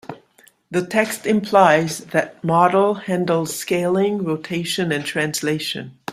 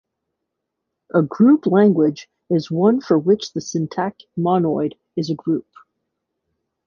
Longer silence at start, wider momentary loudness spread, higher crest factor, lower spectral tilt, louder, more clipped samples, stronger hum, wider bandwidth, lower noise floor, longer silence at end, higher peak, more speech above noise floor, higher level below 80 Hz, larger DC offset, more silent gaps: second, 0.1 s vs 1.15 s; about the same, 9 LU vs 11 LU; about the same, 18 dB vs 16 dB; second, -4.5 dB/octave vs -7.5 dB/octave; about the same, -19 LUFS vs -19 LUFS; neither; neither; first, 16 kHz vs 7.2 kHz; second, -54 dBFS vs -79 dBFS; second, 0 s vs 1.25 s; about the same, -2 dBFS vs -4 dBFS; second, 35 dB vs 61 dB; about the same, -62 dBFS vs -62 dBFS; neither; neither